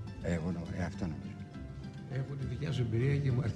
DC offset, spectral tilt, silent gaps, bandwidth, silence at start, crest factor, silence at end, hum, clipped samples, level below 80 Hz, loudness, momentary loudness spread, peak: under 0.1%; -8 dB/octave; none; 9.4 kHz; 0 s; 16 dB; 0 s; none; under 0.1%; -52 dBFS; -36 LUFS; 14 LU; -20 dBFS